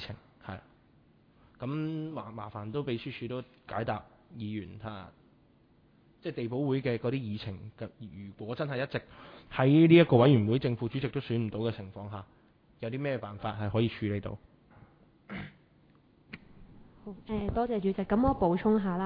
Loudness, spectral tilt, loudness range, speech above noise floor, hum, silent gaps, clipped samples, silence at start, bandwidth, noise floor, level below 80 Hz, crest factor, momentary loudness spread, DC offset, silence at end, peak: -30 LUFS; -10.5 dB/octave; 14 LU; 34 dB; none; none; under 0.1%; 0 s; 5.2 kHz; -64 dBFS; -54 dBFS; 24 dB; 21 LU; under 0.1%; 0 s; -8 dBFS